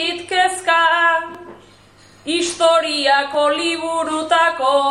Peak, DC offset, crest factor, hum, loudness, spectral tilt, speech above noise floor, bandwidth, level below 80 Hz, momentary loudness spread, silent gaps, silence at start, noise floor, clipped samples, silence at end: -2 dBFS; under 0.1%; 14 dB; none; -16 LUFS; -1 dB/octave; 31 dB; 12.5 kHz; -62 dBFS; 8 LU; none; 0 s; -47 dBFS; under 0.1%; 0 s